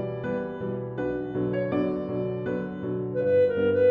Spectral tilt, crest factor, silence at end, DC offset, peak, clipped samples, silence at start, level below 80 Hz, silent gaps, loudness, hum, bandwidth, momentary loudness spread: -10 dB/octave; 14 dB; 0 s; under 0.1%; -12 dBFS; under 0.1%; 0 s; -56 dBFS; none; -27 LUFS; none; 4.9 kHz; 9 LU